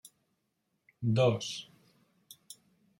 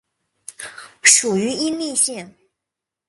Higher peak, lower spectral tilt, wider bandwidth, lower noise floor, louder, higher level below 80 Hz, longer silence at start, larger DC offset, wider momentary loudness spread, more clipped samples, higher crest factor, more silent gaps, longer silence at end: second, -14 dBFS vs 0 dBFS; first, -6 dB/octave vs -1.5 dB/octave; first, 16.5 kHz vs 12 kHz; second, -80 dBFS vs -84 dBFS; second, -31 LUFS vs -16 LUFS; second, -74 dBFS vs -64 dBFS; first, 1 s vs 0.5 s; neither; first, 25 LU vs 22 LU; neither; about the same, 20 dB vs 22 dB; neither; second, 0.45 s vs 0.8 s